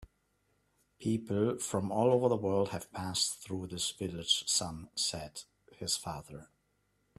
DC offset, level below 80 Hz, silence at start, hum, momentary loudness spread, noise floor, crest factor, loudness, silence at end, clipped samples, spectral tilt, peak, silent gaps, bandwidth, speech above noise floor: under 0.1%; -64 dBFS; 0 s; none; 14 LU; -76 dBFS; 20 dB; -33 LUFS; 0.75 s; under 0.1%; -3.5 dB/octave; -14 dBFS; none; 13.5 kHz; 43 dB